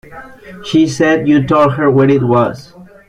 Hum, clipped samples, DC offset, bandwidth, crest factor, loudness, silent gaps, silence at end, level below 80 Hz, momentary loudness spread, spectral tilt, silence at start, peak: none; under 0.1%; under 0.1%; 10.5 kHz; 12 dB; -12 LUFS; none; 0.25 s; -46 dBFS; 8 LU; -7 dB/octave; 0.1 s; -2 dBFS